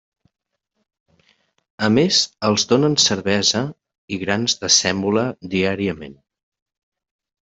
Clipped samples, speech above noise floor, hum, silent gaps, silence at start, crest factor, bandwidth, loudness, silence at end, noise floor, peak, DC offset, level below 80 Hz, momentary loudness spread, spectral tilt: under 0.1%; 43 dB; none; 3.98-4.08 s; 1.8 s; 20 dB; 8.4 kHz; -18 LUFS; 1.4 s; -62 dBFS; -2 dBFS; under 0.1%; -58 dBFS; 12 LU; -3 dB/octave